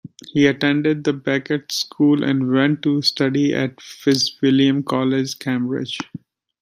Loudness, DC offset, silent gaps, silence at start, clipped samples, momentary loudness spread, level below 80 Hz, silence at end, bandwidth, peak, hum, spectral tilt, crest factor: -19 LUFS; under 0.1%; none; 0.05 s; under 0.1%; 8 LU; -62 dBFS; 0.45 s; 15 kHz; -2 dBFS; none; -5 dB/octave; 16 dB